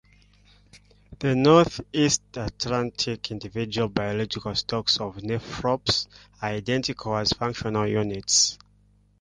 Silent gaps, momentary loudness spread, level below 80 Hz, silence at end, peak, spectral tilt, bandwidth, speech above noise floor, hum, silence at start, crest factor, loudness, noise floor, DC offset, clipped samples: none; 12 LU; -50 dBFS; 0.65 s; -4 dBFS; -3.5 dB/octave; 11.5 kHz; 35 dB; 50 Hz at -50 dBFS; 0.75 s; 22 dB; -24 LUFS; -60 dBFS; under 0.1%; under 0.1%